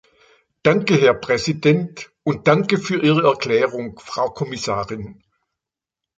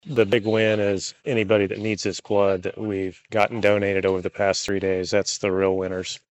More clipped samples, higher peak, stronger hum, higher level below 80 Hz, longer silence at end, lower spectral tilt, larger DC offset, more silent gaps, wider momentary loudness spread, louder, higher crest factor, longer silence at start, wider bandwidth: neither; first, 0 dBFS vs -6 dBFS; neither; first, -54 dBFS vs -60 dBFS; first, 1.05 s vs 0.15 s; first, -6 dB/octave vs -4.5 dB/octave; neither; neither; first, 13 LU vs 7 LU; first, -19 LUFS vs -23 LUFS; about the same, 20 dB vs 18 dB; first, 0.65 s vs 0.05 s; about the same, 9 kHz vs 8.6 kHz